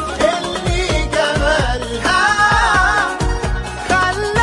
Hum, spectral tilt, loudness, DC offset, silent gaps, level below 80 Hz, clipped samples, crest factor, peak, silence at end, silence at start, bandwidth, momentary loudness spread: none; -4 dB/octave; -16 LUFS; under 0.1%; none; -24 dBFS; under 0.1%; 12 dB; -2 dBFS; 0 s; 0 s; 11.5 kHz; 8 LU